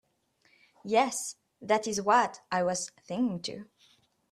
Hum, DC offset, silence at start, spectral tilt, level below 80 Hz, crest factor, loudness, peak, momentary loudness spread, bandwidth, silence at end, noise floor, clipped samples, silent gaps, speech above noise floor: none; under 0.1%; 0.85 s; -3.5 dB/octave; -74 dBFS; 20 dB; -29 LUFS; -10 dBFS; 14 LU; 14 kHz; 0.7 s; -70 dBFS; under 0.1%; none; 41 dB